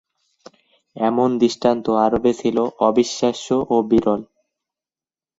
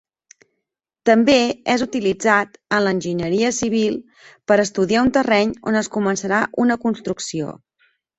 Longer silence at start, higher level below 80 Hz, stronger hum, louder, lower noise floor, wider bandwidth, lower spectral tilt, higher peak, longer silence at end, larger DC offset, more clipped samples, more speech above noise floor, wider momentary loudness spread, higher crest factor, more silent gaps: about the same, 0.95 s vs 1.05 s; about the same, -52 dBFS vs -54 dBFS; neither; about the same, -19 LUFS vs -19 LUFS; first, under -90 dBFS vs -80 dBFS; about the same, 8 kHz vs 8.2 kHz; about the same, -5.5 dB/octave vs -4.5 dB/octave; about the same, -2 dBFS vs -2 dBFS; first, 1.15 s vs 0.65 s; neither; neither; first, over 72 dB vs 61 dB; second, 5 LU vs 9 LU; about the same, 18 dB vs 18 dB; neither